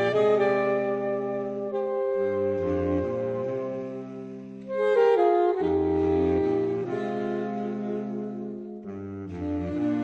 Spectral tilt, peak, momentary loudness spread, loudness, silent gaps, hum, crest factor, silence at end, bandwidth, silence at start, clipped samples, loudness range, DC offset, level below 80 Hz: -8.5 dB/octave; -10 dBFS; 15 LU; -26 LUFS; none; none; 16 dB; 0 s; 7.2 kHz; 0 s; under 0.1%; 5 LU; under 0.1%; -54 dBFS